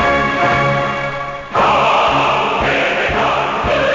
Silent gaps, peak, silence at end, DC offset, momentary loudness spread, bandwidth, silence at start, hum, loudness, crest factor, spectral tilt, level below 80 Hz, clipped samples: none; -4 dBFS; 0 s; 0.3%; 7 LU; 7.6 kHz; 0 s; none; -14 LUFS; 10 dB; -5 dB/octave; -36 dBFS; under 0.1%